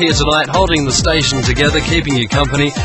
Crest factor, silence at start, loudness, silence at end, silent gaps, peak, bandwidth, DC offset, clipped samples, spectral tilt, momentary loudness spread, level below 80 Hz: 14 dB; 0 s; -13 LUFS; 0 s; none; 0 dBFS; 11 kHz; under 0.1%; under 0.1%; -4 dB/octave; 2 LU; -24 dBFS